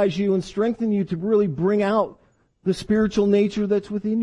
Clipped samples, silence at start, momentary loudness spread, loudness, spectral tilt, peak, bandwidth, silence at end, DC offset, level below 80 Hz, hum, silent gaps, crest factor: under 0.1%; 0 s; 6 LU; -22 LUFS; -7.5 dB/octave; -8 dBFS; 11 kHz; 0 s; under 0.1%; -52 dBFS; none; none; 14 dB